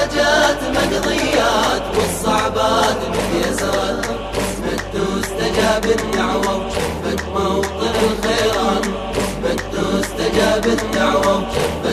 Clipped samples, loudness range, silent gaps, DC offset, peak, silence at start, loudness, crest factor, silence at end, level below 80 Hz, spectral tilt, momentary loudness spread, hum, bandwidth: under 0.1%; 2 LU; none; under 0.1%; -2 dBFS; 0 s; -18 LUFS; 14 dB; 0 s; -32 dBFS; -4 dB/octave; 6 LU; none; 14 kHz